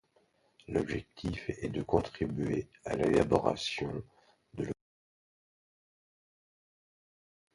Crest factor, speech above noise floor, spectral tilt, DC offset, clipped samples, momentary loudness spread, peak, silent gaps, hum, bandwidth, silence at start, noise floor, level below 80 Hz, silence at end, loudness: 26 dB; 38 dB; -6 dB/octave; under 0.1%; under 0.1%; 11 LU; -10 dBFS; none; none; 11.5 kHz; 0.7 s; -71 dBFS; -54 dBFS; 2.8 s; -33 LUFS